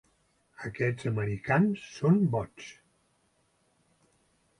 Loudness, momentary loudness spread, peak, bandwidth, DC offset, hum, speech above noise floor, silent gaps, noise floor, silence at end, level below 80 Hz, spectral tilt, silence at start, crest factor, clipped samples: -29 LUFS; 17 LU; -12 dBFS; 11 kHz; under 0.1%; none; 43 dB; none; -71 dBFS; 1.9 s; -62 dBFS; -8 dB/octave; 0.6 s; 18 dB; under 0.1%